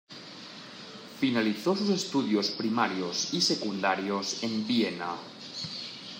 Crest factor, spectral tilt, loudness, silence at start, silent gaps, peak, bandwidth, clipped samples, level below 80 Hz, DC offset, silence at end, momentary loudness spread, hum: 20 dB; -3.5 dB/octave; -29 LUFS; 0.1 s; none; -10 dBFS; 16 kHz; under 0.1%; -78 dBFS; under 0.1%; 0 s; 17 LU; none